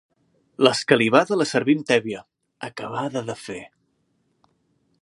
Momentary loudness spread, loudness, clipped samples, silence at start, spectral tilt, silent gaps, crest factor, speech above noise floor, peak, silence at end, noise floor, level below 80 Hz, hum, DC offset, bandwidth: 19 LU; -21 LUFS; under 0.1%; 0.6 s; -4.5 dB/octave; none; 22 dB; 48 dB; -2 dBFS; 1.35 s; -69 dBFS; -68 dBFS; none; under 0.1%; 11.5 kHz